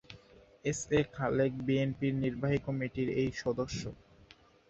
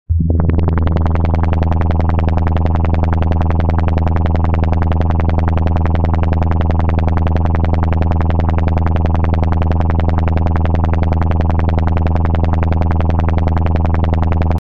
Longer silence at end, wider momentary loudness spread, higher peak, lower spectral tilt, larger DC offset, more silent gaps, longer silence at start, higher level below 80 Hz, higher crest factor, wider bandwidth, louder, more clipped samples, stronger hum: first, 0.75 s vs 0.05 s; first, 9 LU vs 0 LU; second, -16 dBFS vs -4 dBFS; second, -6 dB/octave vs -10 dB/octave; second, under 0.1% vs 8%; neither; about the same, 0.1 s vs 0.05 s; second, -56 dBFS vs -18 dBFS; first, 18 dB vs 10 dB; first, 8.2 kHz vs 4.5 kHz; second, -33 LUFS vs -15 LUFS; neither; neither